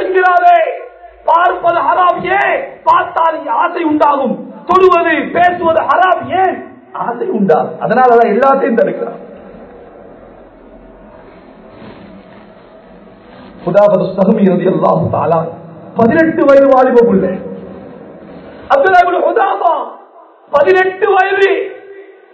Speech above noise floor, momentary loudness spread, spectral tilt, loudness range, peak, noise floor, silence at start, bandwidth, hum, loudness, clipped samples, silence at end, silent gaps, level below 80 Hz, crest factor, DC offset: 30 dB; 16 LU; -8 dB/octave; 4 LU; 0 dBFS; -40 dBFS; 0 s; 8 kHz; none; -11 LUFS; 0.5%; 0.3 s; none; -50 dBFS; 12 dB; under 0.1%